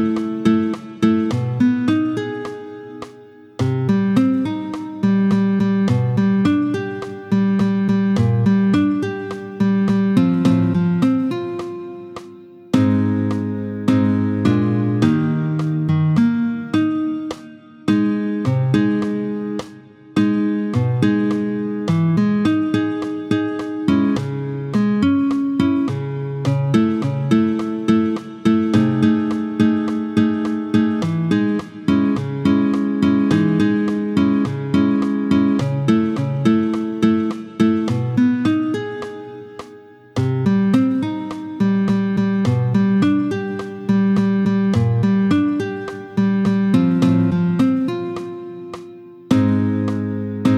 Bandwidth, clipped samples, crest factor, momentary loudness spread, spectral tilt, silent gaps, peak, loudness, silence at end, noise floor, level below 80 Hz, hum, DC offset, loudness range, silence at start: 10 kHz; under 0.1%; 16 dB; 10 LU; -8 dB/octave; none; -2 dBFS; -18 LUFS; 0 s; -42 dBFS; -54 dBFS; none; under 0.1%; 3 LU; 0 s